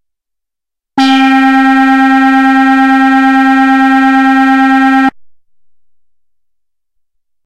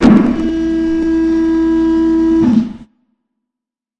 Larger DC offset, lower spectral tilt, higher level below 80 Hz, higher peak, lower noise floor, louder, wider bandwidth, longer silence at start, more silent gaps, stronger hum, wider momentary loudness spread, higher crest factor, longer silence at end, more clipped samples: neither; second, -3.5 dB/octave vs -8 dB/octave; second, -48 dBFS vs -34 dBFS; about the same, 0 dBFS vs 0 dBFS; about the same, -82 dBFS vs -84 dBFS; first, -7 LUFS vs -13 LUFS; first, 9.6 kHz vs 7.6 kHz; first, 0.95 s vs 0 s; neither; neither; second, 2 LU vs 5 LU; about the same, 8 dB vs 12 dB; first, 2.2 s vs 1.15 s; neither